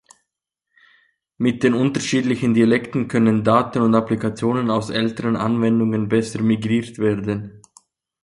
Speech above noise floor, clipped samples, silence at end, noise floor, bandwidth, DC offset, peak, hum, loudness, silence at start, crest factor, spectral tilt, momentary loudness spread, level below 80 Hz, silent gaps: 62 dB; under 0.1%; 0.65 s; -81 dBFS; 11.5 kHz; under 0.1%; -2 dBFS; none; -19 LUFS; 1.4 s; 16 dB; -6.5 dB/octave; 6 LU; -54 dBFS; none